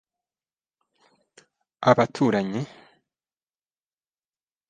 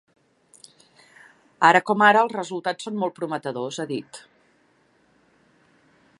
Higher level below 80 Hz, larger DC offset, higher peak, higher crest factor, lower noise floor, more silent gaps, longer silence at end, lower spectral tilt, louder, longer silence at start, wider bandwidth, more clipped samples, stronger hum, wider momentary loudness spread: first, -68 dBFS vs -78 dBFS; neither; about the same, -2 dBFS vs -2 dBFS; about the same, 28 dB vs 24 dB; first, under -90 dBFS vs -62 dBFS; neither; about the same, 2.05 s vs 2 s; first, -6.5 dB/octave vs -4.5 dB/octave; about the same, -23 LUFS vs -21 LUFS; first, 1.8 s vs 1.6 s; second, 9.4 kHz vs 11.5 kHz; neither; neither; about the same, 13 LU vs 15 LU